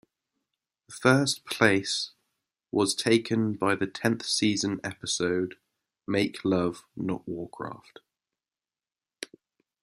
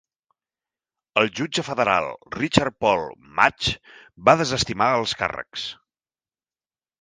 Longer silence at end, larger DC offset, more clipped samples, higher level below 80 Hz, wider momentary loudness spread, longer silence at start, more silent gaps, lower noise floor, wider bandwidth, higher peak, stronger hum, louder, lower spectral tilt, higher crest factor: second, 0.55 s vs 1.25 s; neither; neither; second, -68 dBFS vs -50 dBFS; first, 16 LU vs 12 LU; second, 0.9 s vs 1.15 s; neither; about the same, under -90 dBFS vs under -90 dBFS; first, 15 kHz vs 10 kHz; second, -4 dBFS vs 0 dBFS; neither; second, -27 LUFS vs -22 LUFS; about the same, -4 dB/octave vs -4 dB/octave; about the same, 24 dB vs 24 dB